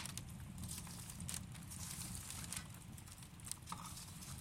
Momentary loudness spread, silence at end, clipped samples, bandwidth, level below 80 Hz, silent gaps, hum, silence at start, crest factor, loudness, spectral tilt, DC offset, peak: 7 LU; 0 s; under 0.1%; 16.5 kHz; -62 dBFS; none; none; 0 s; 28 dB; -49 LUFS; -3 dB/octave; under 0.1%; -22 dBFS